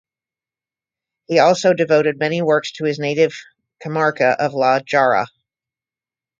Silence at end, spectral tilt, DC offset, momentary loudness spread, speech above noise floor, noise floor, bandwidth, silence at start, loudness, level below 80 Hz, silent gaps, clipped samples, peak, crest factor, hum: 1.15 s; -5 dB/octave; under 0.1%; 8 LU; over 74 dB; under -90 dBFS; 7.8 kHz; 1.3 s; -17 LUFS; -66 dBFS; none; under 0.1%; 0 dBFS; 18 dB; none